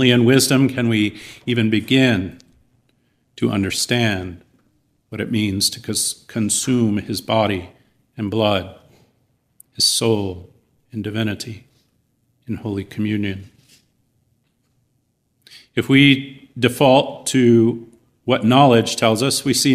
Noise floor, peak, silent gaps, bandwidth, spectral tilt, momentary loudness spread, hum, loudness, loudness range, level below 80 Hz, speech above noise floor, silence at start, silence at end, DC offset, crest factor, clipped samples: -67 dBFS; 0 dBFS; none; 15.5 kHz; -4.5 dB/octave; 16 LU; none; -18 LUFS; 12 LU; -56 dBFS; 50 dB; 0 s; 0 s; under 0.1%; 18 dB; under 0.1%